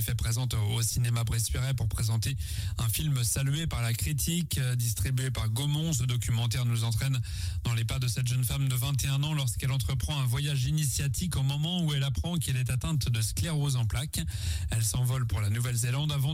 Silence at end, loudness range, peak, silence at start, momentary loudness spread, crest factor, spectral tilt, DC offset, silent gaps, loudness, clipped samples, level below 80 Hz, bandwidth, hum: 0 s; 1 LU; -18 dBFS; 0 s; 3 LU; 12 dB; -4.5 dB/octave; under 0.1%; none; -29 LUFS; under 0.1%; -40 dBFS; 16 kHz; none